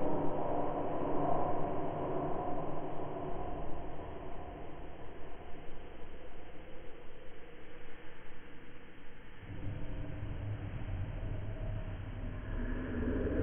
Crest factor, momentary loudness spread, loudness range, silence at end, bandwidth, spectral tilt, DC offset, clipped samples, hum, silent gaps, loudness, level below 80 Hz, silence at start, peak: 16 dB; 18 LU; 15 LU; 0 s; 3.5 kHz; -10.5 dB/octave; under 0.1%; under 0.1%; none; none; -40 LUFS; -46 dBFS; 0 s; -18 dBFS